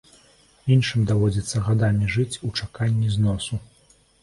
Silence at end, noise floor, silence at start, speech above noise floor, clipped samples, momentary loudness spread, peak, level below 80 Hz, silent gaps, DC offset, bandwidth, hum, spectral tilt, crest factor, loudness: 0.6 s; -58 dBFS; 0.65 s; 36 dB; under 0.1%; 9 LU; -6 dBFS; -44 dBFS; none; under 0.1%; 11.5 kHz; none; -6 dB/octave; 16 dB; -23 LUFS